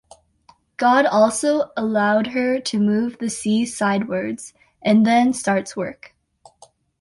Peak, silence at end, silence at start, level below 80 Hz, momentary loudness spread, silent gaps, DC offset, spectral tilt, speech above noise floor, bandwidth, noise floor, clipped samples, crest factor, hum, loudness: -4 dBFS; 1.1 s; 0.8 s; -60 dBFS; 13 LU; none; under 0.1%; -5 dB/octave; 37 dB; 11.5 kHz; -56 dBFS; under 0.1%; 16 dB; none; -19 LUFS